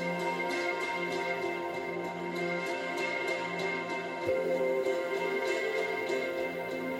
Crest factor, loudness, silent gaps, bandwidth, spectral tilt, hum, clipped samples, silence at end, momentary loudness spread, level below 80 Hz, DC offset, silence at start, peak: 16 dB; -32 LUFS; none; 16.5 kHz; -4.5 dB/octave; none; under 0.1%; 0 s; 5 LU; -72 dBFS; under 0.1%; 0 s; -18 dBFS